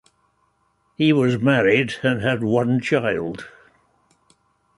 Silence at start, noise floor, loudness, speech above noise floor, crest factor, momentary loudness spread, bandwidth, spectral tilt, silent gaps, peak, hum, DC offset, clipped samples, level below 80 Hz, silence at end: 1 s; -66 dBFS; -20 LUFS; 47 dB; 18 dB; 11 LU; 11.5 kHz; -7 dB/octave; none; -4 dBFS; none; under 0.1%; under 0.1%; -56 dBFS; 1.3 s